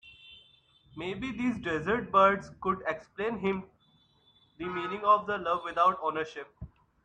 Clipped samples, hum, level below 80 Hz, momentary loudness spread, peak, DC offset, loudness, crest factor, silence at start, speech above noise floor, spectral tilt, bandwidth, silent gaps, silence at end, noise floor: under 0.1%; none; -60 dBFS; 18 LU; -10 dBFS; under 0.1%; -29 LUFS; 20 dB; 0.05 s; 37 dB; -6.5 dB/octave; 9.2 kHz; none; 0.35 s; -66 dBFS